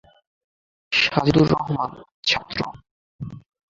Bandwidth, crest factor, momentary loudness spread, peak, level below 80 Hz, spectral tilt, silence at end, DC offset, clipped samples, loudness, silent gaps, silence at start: 7.6 kHz; 22 dB; 19 LU; -2 dBFS; -48 dBFS; -5.5 dB/octave; 0.3 s; under 0.1%; under 0.1%; -21 LUFS; 2.14-2.23 s, 2.91-3.19 s; 0.9 s